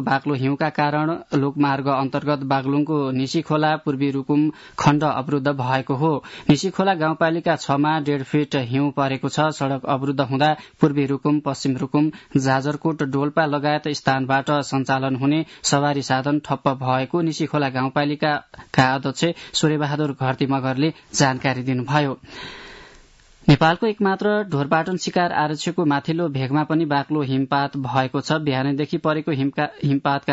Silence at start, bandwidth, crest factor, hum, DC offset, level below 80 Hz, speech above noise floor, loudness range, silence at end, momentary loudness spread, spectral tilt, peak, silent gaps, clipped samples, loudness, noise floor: 0 s; 8 kHz; 16 dB; none; under 0.1%; -56 dBFS; 29 dB; 1 LU; 0 s; 4 LU; -5.5 dB/octave; -4 dBFS; none; under 0.1%; -21 LUFS; -50 dBFS